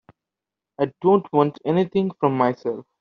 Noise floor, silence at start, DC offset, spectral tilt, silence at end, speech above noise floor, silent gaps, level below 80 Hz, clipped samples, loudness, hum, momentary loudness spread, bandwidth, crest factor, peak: -87 dBFS; 0.8 s; under 0.1%; -7 dB/octave; 0.2 s; 66 dB; none; -66 dBFS; under 0.1%; -21 LUFS; none; 9 LU; 6 kHz; 18 dB; -4 dBFS